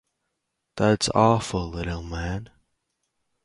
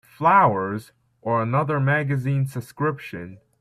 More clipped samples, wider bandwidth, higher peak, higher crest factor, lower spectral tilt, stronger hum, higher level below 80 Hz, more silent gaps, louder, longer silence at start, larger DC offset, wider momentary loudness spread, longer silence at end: neither; second, 11.5 kHz vs 13.5 kHz; about the same, -4 dBFS vs -6 dBFS; about the same, 22 dB vs 18 dB; second, -5.5 dB/octave vs -8 dB/octave; neither; first, -42 dBFS vs -60 dBFS; neither; about the same, -24 LUFS vs -22 LUFS; first, 0.75 s vs 0.2 s; neither; second, 13 LU vs 17 LU; first, 1 s vs 0.25 s